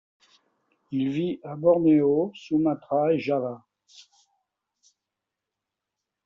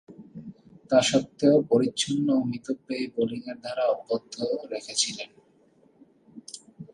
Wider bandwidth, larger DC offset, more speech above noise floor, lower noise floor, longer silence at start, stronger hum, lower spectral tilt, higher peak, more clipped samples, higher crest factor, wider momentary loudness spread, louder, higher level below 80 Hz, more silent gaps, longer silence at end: second, 7 kHz vs 11.5 kHz; neither; first, 63 dB vs 35 dB; first, -86 dBFS vs -61 dBFS; first, 0.9 s vs 0.1 s; neither; first, -7 dB/octave vs -4 dB/octave; about the same, -8 dBFS vs -8 dBFS; neither; about the same, 18 dB vs 20 dB; second, 11 LU vs 22 LU; about the same, -24 LUFS vs -26 LUFS; about the same, -68 dBFS vs -68 dBFS; neither; first, 2.7 s vs 0.05 s